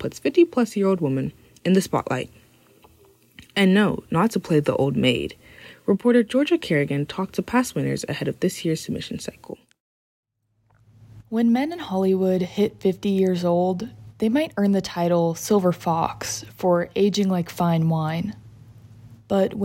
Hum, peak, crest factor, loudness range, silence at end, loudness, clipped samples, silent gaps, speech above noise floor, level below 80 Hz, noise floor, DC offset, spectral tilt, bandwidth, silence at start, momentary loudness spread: none; -6 dBFS; 16 dB; 6 LU; 0 s; -22 LUFS; under 0.1%; 9.80-10.23 s; 45 dB; -58 dBFS; -66 dBFS; under 0.1%; -6 dB/octave; 16.5 kHz; 0 s; 10 LU